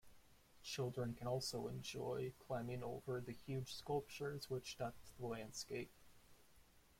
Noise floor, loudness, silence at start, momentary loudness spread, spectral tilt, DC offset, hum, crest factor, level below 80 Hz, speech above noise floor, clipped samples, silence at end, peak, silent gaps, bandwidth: -69 dBFS; -47 LUFS; 0.05 s; 6 LU; -5 dB/octave; under 0.1%; none; 16 dB; -70 dBFS; 22 dB; under 0.1%; 0.05 s; -30 dBFS; none; 16.5 kHz